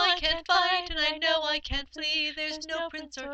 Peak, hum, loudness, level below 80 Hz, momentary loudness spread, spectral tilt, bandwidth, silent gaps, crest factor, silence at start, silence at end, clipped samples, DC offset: -8 dBFS; none; -27 LUFS; -46 dBFS; 10 LU; -2 dB/octave; 8.6 kHz; none; 20 dB; 0 s; 0 s; under 0.1%; under 0.1%